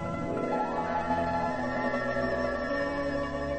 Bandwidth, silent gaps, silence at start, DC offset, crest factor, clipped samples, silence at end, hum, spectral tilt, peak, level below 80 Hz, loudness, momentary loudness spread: 8.8 kHz; none; 0 s; under 0.1%; 14 dB; under 0.1%; 0 s; none; -6.5 dB/octave; -16 dBFS; -48 dBFS; -30 LUFS; 2 LU